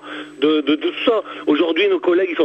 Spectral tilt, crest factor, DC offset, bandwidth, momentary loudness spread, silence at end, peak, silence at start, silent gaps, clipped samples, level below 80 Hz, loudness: -5.5 dB/octave; 14 dB; under 0.1%; 8.4 kHz; 5 LU; 0 s; -4 dBFS; 0.05 s; none; under 0.1%; -66 dBFS; -18 LUFS